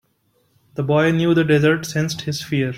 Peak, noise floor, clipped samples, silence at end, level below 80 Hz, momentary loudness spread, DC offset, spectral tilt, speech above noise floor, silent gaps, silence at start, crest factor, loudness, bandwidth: -4 dBFS; -64 dBFS; under 0.1%; 0 s; -54 dBFS; 10 LU; under 0.1%; -6 dB/octave; 46 dB; none; 0.75 s; 16 dB; -18 LUFS; 16 kHz